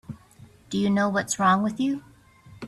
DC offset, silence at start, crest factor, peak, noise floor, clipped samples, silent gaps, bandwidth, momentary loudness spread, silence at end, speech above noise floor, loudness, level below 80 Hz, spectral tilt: under 0.1%; 0.1 s; 18 dB; -8 dBFS; -52 dBFS; under 0.1%; none; 13.5 kHz; 16 LU; 0 s; 29 dB; -24 LUFS; -62 dBFS; -5 dB/octave